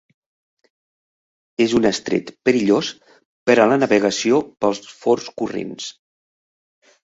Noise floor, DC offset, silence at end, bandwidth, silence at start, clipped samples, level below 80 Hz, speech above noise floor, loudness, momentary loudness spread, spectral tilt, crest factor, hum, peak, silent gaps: under -90 dBFS; under 0.1%; 1.1 s; 8 kHz; 1.6 s; under 0.1%; -58 dBFS; over 72 dB; -19 LUFS; 13 LU; -4.5 dB/octave; 20 dB; none; -2 dBFS; 3.25-3.46 s